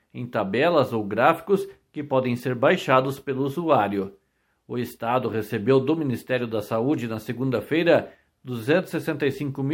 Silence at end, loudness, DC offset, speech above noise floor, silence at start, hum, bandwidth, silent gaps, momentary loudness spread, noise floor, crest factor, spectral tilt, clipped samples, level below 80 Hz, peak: 0 s; -24 LUFS; under 0.1%; 34 dB; 0.15 s; none; 17 kHz; none; 10 LU; -57 dBFS; 20 dB; -7 dB/octave; under 0.1%; -64 dBFS; -4 dBFS